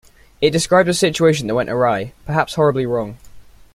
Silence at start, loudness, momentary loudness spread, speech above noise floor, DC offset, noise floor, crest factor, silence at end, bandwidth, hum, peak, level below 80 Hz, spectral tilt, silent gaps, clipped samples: 0.4 s; -17 LUFS; 8 LU; 23 dB; under 0.1%; -40 dBFS; 16 dB; 0.35 s; 15.5 kHz; none; -2 dBFS; -46 dBFS; -5 dB/octave; none; under 0.1%